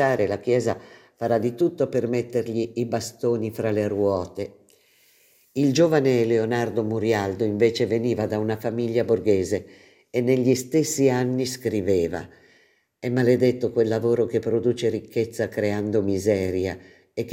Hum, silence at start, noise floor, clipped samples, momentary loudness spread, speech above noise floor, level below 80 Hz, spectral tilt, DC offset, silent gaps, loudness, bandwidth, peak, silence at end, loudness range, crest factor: none; 0 s; -61 dBFS; under 0.1%; 8 LU; 38 dB; -64 dBFS; -6 dB/octave; under 0.1%; none; -23 LUFS; 16 kHz; -6 dBFS; 0 s; 3 LU; 16 dB